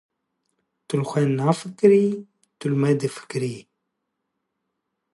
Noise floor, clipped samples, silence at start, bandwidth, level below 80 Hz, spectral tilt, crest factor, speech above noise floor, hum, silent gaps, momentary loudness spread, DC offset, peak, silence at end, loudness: -79 dBFS; under 0.1%; 0.9 s; 11.5 kHz; -72 dBFS; -7 dB/octave; 20 dB; 58 dB; none; none; 14 LU; under 0.1%; -4 dBFS; 1.5 s; -22 LUFS